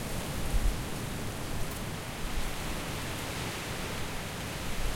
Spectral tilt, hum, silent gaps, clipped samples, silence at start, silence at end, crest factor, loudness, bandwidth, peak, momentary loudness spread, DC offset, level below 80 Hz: -4 dB/octave; none; none; under 0.1%; 0 s; 0 s; 18 dB; -36 LUFS; 16.5 kHz; -16 dBFS; 3 LU; under 0.1%; -38 dBFS